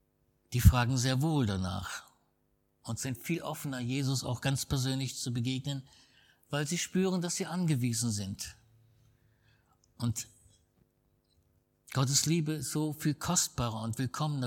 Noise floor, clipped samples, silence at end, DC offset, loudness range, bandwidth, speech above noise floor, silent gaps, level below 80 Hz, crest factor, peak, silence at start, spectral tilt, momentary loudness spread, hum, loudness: -75 dBFS; under 0.1%; 0 s; under 0.1%; 8 LU; 18 kHz; 43 dB; none; -46 dBFS; 26 dB; -8 dBFS; 0.5 s; -4.5 dB/octave; 12 LU; none; -32 LUFS